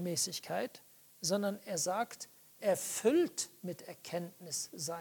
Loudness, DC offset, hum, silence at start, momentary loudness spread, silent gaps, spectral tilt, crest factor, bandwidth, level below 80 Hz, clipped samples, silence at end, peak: -36 LUFS; under 0.1%; none; 0 s; 14 LU; none; -3.5 dB/octave; 20 dB; 19 kHz; -86 dBFS; under 0.1%; 0 s; -16 dBFS